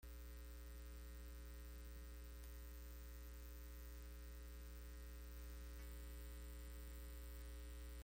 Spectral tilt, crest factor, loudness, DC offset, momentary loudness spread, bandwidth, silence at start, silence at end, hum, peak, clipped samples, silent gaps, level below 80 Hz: -5 dB/octave; 14 dB; -57 LUFS; under 0.1%; 2 LU; 17 kHz; 0 s; 0 s; none; -40 dBFS; under 0.1%; none; -54 dBFS